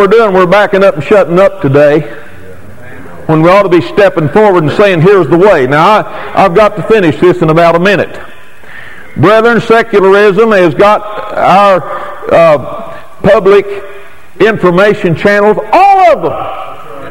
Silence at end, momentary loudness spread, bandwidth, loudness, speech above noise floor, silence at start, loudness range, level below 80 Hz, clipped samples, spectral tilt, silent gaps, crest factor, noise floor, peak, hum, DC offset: 0 s; 14 LU; 16.5 kHz; -6 LUFS; 25 dB; 0 s; 2 LU; -38 dBFS; 5%; -7 dB/octave; none; 8 dB; -31 dBFS; 0 dBFS; none; 5%